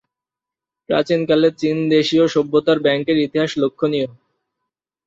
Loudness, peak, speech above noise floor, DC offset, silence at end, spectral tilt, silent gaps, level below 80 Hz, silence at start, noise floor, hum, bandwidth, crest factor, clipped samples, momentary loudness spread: -17 LUFS; -4 dBFS; 71 dB; under 0.1%; 0.95 s; -6 dB/octave; none; -60 dBFS; 0.9 s; -87 dBFS; none; 7.8 kHz; 16 dB; under 0.1%; 5 LU